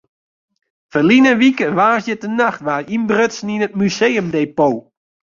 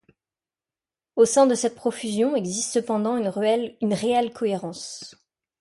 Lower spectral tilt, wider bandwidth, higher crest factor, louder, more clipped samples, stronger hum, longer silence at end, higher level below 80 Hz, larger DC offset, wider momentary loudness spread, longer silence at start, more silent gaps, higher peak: about the same, -5.5 dB/octave vs -4.5 dB/octave; second, 7.4 kHz vs 11.5 kHz; about the same, 14 dB vs 18 dB; first, -15 LUFS vs -23 LUFS; neither; neither; about the same, 0.45 s vs 0.5 s; first, -58 dBFS vs -68 dBFS; neither; second, 10 LU vs 14 LU; second, 0.95 s vs 1.15 s; neither; first, -2 dBFS vs -6 dBFS